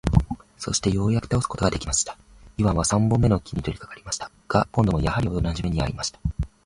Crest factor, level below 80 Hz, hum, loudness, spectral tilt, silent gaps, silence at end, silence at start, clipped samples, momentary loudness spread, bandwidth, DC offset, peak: 20 dB; -34 dBFS; none; -24 LUFS; -5 dB/octave; none; 0.2 s; 0.05 s; under 0.1%; 10 LU; 11.5 kHz; under 0.1%; -2 dBFS